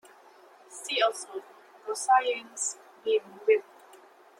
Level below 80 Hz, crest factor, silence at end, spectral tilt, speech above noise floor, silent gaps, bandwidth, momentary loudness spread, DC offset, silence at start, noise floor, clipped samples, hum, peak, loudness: under -90 dBFS; 20 dB; 0.8 s; 0.5 dB/octave; 27 dB; none; 14 kHz; 17 LU; under 0.1%; 0.7 s; -55 dBFS; under 0.1%; none; -10 dBFS; -28 LUFS